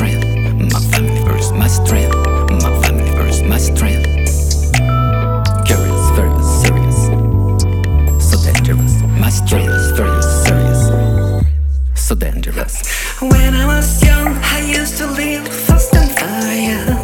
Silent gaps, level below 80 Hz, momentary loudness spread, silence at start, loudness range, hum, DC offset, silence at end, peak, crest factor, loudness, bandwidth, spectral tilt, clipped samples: none; -16 dBFS; 5 LU; 0 s; 2 LU; none; under 0.1%; 0 s; 0 dBFS; 12 dB; -13 LUFS; 19 kHz; -5 dB/octave; under 0.1%